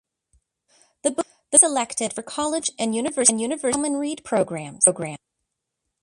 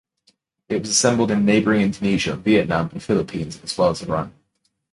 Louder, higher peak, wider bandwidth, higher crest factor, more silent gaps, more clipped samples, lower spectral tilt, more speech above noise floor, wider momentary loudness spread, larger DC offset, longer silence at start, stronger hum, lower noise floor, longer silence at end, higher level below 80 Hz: about the same, -21 LUFS vs -20 LUFS; first, 0 dBFS vs -4 dBFS; about the same, 11.5 kHz vs 11.5 kHz; first, 24 dB vs 18 dB; neither; neither; second, -2.5 dB/octave vs -4.5 dB/octave; first, 57 dB vs 51 dB; about the same, 12 LU vs 10 LU; neither; first, 1.05 s vs 0.7 s; neither; first, -80 dBFS vs -71 dBFS; first, 0.85 s vs 0.6 s; second, -64 dBFS vs -48 dBFS